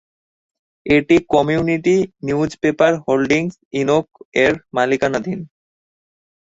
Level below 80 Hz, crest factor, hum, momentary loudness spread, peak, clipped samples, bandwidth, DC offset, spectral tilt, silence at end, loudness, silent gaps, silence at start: -50 dBFS; 16 dB; none; 9 LU; -2 dBFS; under 0.1%; 8 kHz; under 0.1%; -6 dB/octave; 1.05 s; -17 LUFS; 3.65-3.71 s, 4.25-4.32 s; 0.85 s